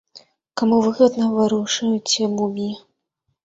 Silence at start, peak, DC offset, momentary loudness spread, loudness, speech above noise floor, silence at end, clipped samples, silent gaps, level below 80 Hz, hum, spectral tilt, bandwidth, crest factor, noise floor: 0.15 s; -2 dBFS; under 0.1%; 12 LU; -19 LUFS; 55 dB; 0.65 s; under 0.1%; none; -62 dBFS; none; -4 dB/octave; 8 kHz; 18 dB; -74 dBFS